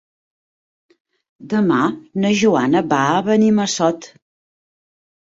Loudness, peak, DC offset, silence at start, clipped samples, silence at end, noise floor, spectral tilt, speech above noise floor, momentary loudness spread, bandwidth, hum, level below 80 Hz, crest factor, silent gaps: -17 LUFS; -4 dBFS; under 0.1%; 1.4 s; under 0.1%; 1.15 s; under -90 dBFS; -5 dB/octave; over 74 dB; 6 LU; 8 kHz; none; -60 dBFS; 16 dB; none